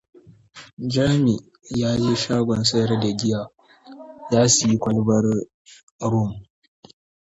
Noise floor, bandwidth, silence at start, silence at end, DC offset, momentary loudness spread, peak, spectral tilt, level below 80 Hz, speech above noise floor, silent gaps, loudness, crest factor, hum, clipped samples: -46 dBFS; 8 kHz; 0.55 s; 0.85 s; under 0.1%; 14 LU; -4 dBFS; -5 dB/octave; -52 dBFS; 26 dB; 0.73-0.77 s, 5.54-5.65 s, 5.83-5.99 s; -21 LUFS; 18 dB; none; under 0.1%